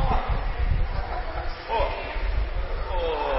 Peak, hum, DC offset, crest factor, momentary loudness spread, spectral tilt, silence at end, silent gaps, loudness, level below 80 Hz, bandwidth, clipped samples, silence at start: -12 dBFS; none; under 0.1%; 14 dB; 5 LU; -10 dB/octave; 0 s; none; -29 LUFS; -28 dBFS; 5.8 kHz; under 0.1%; 0 s